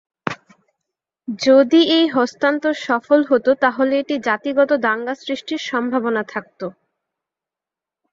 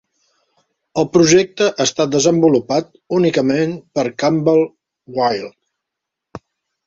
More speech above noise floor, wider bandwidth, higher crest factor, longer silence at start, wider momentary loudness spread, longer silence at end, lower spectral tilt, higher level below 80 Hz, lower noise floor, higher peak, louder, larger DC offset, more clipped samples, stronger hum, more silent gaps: first, 70 dB vs 66 dB; about the same, 7.6 kHz vs 8 kHz; about the same, 18 dB vs 16 dB; second, 0.25 s vs 0.95 s; first, 15 LU vs 10 LU; first, 1.4 s vs 0.5 s; about the same, -4.5 dB/octave vs -4.5 dB/octave; second, -66 dBFS vs -56 dBFS; first, -88 dBFS vs -81 dBFS; about the same, -2 dBFS vs -2 dBFS; about the same, -18 LUFS vs -16 LUFS; neither; neither; neither; neither